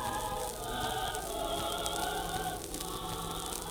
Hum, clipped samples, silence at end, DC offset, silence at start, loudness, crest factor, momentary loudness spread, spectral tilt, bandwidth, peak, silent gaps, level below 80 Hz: none; under 0.1%; 0 s; under 0.1%; 0 s; -36 LUFS; 26 dB; 4 LU; -2.5 dB/octave; over 20 kHz; -10 dBFS; none; -48 dBFS